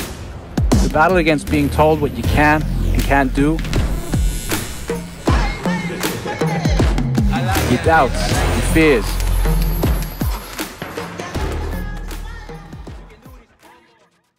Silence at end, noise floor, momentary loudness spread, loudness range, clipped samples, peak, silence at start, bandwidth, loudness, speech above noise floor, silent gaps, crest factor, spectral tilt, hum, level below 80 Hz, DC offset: 1 s; -56 dBFS; 14 LU; 11 LU; under 0.1%; 0 dBFS; 0 s; 16.5 kHz; -18 LUFS; 42 dB; none; 16 dB; -5.5 dB/octave; none; -22 dBFS; under 0.1%